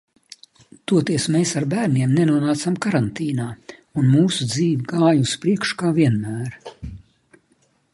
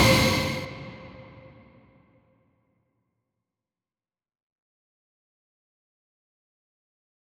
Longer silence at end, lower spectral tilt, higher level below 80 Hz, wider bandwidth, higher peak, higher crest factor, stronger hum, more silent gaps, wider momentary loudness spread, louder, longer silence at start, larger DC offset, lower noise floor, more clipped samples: second, 0.95 s vs 6.2 s; first, -6 dB/octave vs -4 dB/octave; about the same, -52 dBFS vs -48 dBFS; second, 11.5 kHz vs over 20 kHz; about the same, -4 dBFS vs -6 dBFS; second, 18 dB vs 26 dB; neither; neither; second, 15 LU vs 27 LU; first, -20 LUFS vs -24 LUFS; first, 0.9 s vs 0 s; neither; second, -62 dBFS vs under -90 dBFS; neither